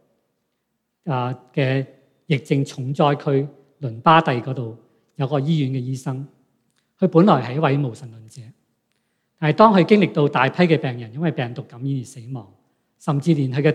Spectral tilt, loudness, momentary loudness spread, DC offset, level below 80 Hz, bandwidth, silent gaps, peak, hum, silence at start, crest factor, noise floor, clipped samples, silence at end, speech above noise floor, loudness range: -7.5 dB/octave; -20 LUFS; 18 LU; under 0.1%; -68 dBFS; 10.5 kHz; none; 0 dBFS; none; 1.05 s; 20 dB; -75 dBFS; under 0.1%; 0 s; 55 dB; 5 LU